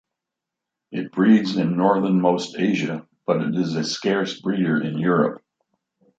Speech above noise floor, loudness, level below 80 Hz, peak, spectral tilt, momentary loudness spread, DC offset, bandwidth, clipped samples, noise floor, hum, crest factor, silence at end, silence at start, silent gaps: 64 dB; -21 LUFS; -68 dBFS; -4 dBFS; -6.5 dB/octave; 9 LU; under 0.1%; 7.8 kHz; under 0.1%; -85 dBFS; none; 18 dB; 0.8 s; 0.9 s; none